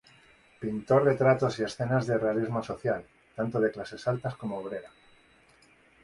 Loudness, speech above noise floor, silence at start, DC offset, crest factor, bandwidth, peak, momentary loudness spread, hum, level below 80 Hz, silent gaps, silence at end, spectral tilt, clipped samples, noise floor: -29 LUFS; 33 dB; 0.6 s; under 0.1%; 20 dB; 11.5 kHz; -10 dBFS; 13 LU; none; -62 dBFS; none; 1.15 s; -7 dB/octave; under 0.1%; -61 dBFS